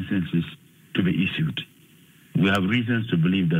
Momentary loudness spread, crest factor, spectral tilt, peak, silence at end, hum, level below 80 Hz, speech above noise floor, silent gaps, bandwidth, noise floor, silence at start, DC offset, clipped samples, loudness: 10 LU; 16 dB; -7.5 dB/octave; -8 dBFS; 0 s; none; -58 dBFS; 31 dB; none; 15 kHz; -54 dBFS; 0 s; under 0.1%; under 0.1%; -24 LUFS